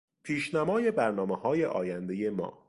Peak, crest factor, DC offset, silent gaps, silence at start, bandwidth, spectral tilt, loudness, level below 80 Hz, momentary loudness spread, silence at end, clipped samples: -14 dBFS; 16 dB; under 0.1%; none; 0.25 s; 11.5 kHz; -6.5 dB/octave; -30 LUFS; -66 dBFS; 6 LU; 0.15 s; under 0.1%